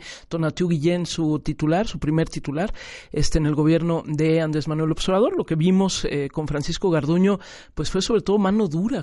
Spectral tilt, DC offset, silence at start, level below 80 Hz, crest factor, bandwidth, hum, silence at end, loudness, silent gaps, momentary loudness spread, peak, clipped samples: -6 dB/octave; under 0.1%; 0 s; -38 dBFS; 16 dB; 11.5 kHz; none; 0 s; -22 LUFS; none; 7 LU; -4 dBFS; under 0.1%